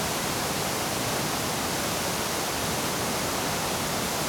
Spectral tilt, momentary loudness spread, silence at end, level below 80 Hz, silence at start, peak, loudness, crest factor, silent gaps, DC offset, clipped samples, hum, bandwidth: -2.5 dB/octave; 0 LU; 0 s; -50 dBFS; 0 s; -16 dBFS; -27 LUFS; 12 dB; none; under 0.1%; under 0.1%; none; over 20 kHz